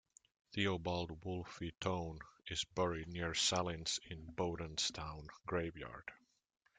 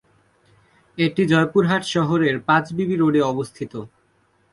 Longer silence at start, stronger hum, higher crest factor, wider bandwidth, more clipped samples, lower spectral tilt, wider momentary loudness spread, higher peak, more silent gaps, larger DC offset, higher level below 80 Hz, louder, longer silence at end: second, 0.5 s vs 0.95 s; neither; about the same, 20 dB vs 18 dB; second, 9.6 kHz vs 11.5 kHz; neither; second, -3.5 dB/octave vs -6.5 dB/octave; about the same, 14 LU vs 14 LU; second, -22 dBFS vs -4 dBFS; neither; neither; about the same, -62 dBFS vs -58 dBFS; second, -41 LUFS vs -20 LUFS; about the same, 0.6 s vs 0.65 s